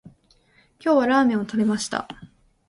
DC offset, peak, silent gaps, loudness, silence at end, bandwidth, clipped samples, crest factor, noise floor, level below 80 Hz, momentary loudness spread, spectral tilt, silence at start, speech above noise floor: under 0.1%; -8 dBFS; none; -22 LUFS; 0.45 s; 11.5 kHz; under 0.1%; 16 dB; -59 dBFS; -60 dBFS; 16 LU; -5 dB/octave; 0.05 s; 38 dB